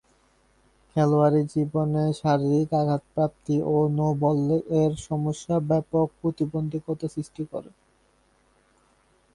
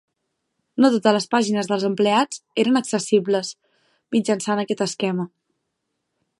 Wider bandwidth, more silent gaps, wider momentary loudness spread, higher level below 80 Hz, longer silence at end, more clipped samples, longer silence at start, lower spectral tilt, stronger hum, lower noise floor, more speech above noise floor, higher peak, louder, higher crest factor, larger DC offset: about the same, 11 kHz vs 11.5 kHz; neither; first, 9 LU vs 6 LU; first, -56 dBFS vs -72 dBFS; first, 1.65 s vs 1.1 s; neither; first, 0.95 s vs 0.75 s; first, -8.5 dB/octave vs -4.5 dB/octave; neither; second, -64 dBFS vs -77 dBFS; second, 40 dB vs 57 dB; second, -8 dBFS vs -2 dBFS; second, -25 LUFS vs -21 LUFS; about the same, 18 dB vs 20 dB; neither